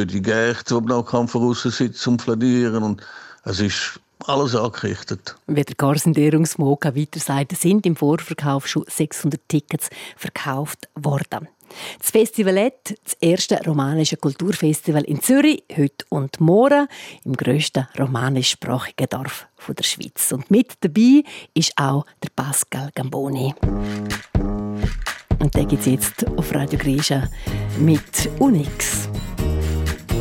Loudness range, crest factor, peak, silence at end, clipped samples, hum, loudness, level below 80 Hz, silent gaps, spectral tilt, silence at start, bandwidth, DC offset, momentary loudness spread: 5 LU; 16 dB; -4 dBFS; 0 s; under 0.1%; none; -20 LUFS; -36 dBFS; none; -5 dB/octave; 0 s; 17 kHz; under 0.1%; 11 LU